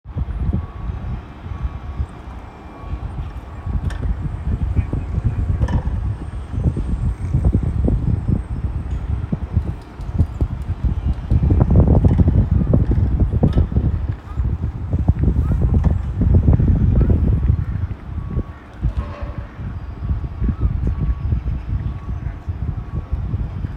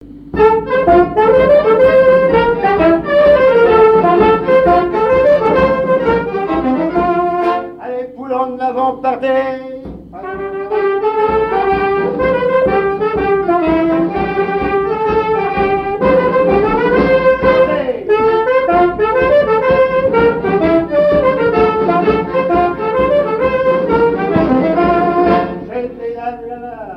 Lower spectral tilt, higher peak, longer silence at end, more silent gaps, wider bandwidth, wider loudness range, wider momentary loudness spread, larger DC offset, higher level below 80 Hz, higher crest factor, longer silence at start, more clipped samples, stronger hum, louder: first, -10 dB/octave vs -8 dB/octave; about the same, 0 dBFS vs 0 dBFS; about the same, 0 s vs 0 s; neither; second, 4.1 kHz vs 5.8 kHz; about the same, 9 LU vs 7 LU; about the same, 14 LU vs 12 LU; neither; first, -22 dBFS vs -36 dBFS; first, 18 dB vs 12 dB; about the same, 0.05 s vs 0.05 s; neither; neither; second, -21 LUFS vs -12 LUFS